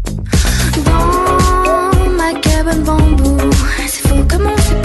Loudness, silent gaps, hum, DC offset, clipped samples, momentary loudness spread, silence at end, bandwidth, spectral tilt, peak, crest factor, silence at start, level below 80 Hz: -12 LUFS; none; none; under 0.1%; under 0.1%; 3 LU; 0 s; 12.5 kHz; -5 dB/octave; -2 dBFS; 10 dB; 0 s; -14 dBFS